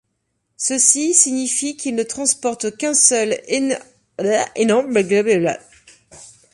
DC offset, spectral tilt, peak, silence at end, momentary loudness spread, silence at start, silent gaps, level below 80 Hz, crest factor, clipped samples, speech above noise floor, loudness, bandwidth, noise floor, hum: under 0.1%; -2.5 dB/octave; 0 dBFS; 0.25 s; 10 LU; 0.6 s; none; -64 dBFS; 20 dB; under 0.1%; 54 dB; -17 LUFS; 11.5 kHz; -71 dBFS; none